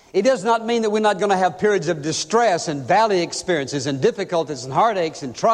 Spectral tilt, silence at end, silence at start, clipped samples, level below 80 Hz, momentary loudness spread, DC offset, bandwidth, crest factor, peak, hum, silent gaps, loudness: -4.5 dB/octave; 0 s; 0.15 s; under 0.1%; -60 dBFS; 5 LU; under 0.1%; 11 kHz; 16 dB; -4 dBFS; none; none; -20 LUFS